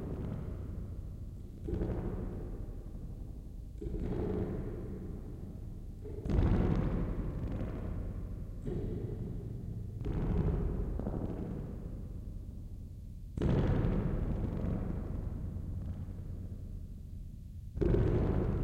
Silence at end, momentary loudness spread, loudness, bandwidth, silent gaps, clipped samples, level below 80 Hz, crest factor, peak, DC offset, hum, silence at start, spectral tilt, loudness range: 0 s; 15 LU; -38 LUFS; 8.2 kHz; none; under 0.1%; -40 dBFS; 18 dB; -18 dBFS; under 0.1%; none; 0 s; -9.5 dB/octave; 5 LU